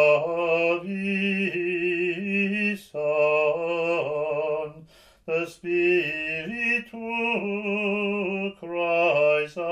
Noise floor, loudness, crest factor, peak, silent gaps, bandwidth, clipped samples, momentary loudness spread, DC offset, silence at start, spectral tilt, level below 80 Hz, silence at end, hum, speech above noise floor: -51 dBFS; -25 LUFS; 16 dB; -8 dBFS; none; 12.5 kHz; under 0.1%; 7 LU; under 0.1%; 0 s; -6.5 dB/octave; -66 dBFS; 0 s; none; 27 dB